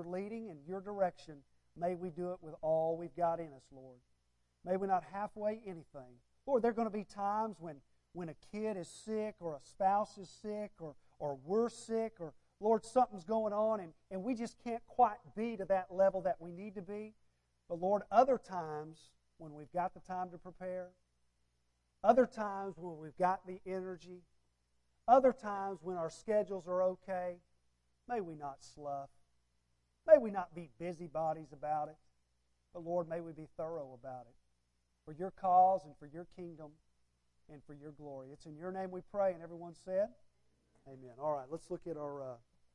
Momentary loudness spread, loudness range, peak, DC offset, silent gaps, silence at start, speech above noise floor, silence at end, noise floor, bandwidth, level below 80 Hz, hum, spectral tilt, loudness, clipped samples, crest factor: 20 LU; 7 LU; -12 dBFS; under 0.1%; none; 0 s; 42 dB; 0.4 s; -79 dBFS; 11 kHz; -72 dBFS; 60 Hz at -70 dBFS; -7 dB/octave; -37 LUFS; under 0.1%; 26 dB